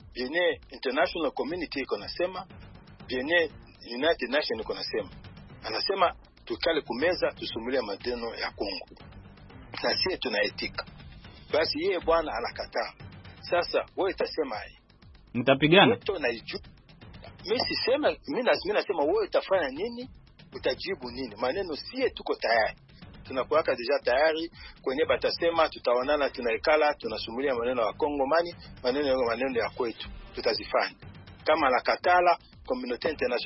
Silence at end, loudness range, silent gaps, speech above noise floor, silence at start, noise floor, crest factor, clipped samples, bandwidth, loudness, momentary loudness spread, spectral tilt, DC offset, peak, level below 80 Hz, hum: 0 s; 5 LU; none; 26 dB; 0 s; -54 dBFS; 24 dB; under 0.1%; 5.8 kHz; -28 LUFS; 15 LU; -8 dB/octave; under 0.1%; -4 dBFS; -54 dBFS; none